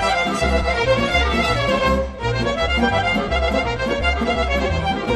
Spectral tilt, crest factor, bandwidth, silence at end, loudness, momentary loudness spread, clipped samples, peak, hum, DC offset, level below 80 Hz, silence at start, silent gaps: -5 dB/octave; 14 dB; 12.5 kHz; 0 s; -19 LUFS; 4 LU; under 0.1%; -4 dBFS; none; under 0.1%; -26 dBFS; 0 s; none